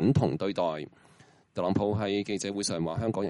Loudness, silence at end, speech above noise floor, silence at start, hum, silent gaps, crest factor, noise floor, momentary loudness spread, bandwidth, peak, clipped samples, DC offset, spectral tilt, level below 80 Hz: -30 LUFS; 0 s; 30 dB; 0 s; none; none; 16 dB; -59 dBFS; 9 LU; 11.5 kHz; -12 dBFS; under 0.1%; under 0.1%; -6 dB/octave; -58 dBFS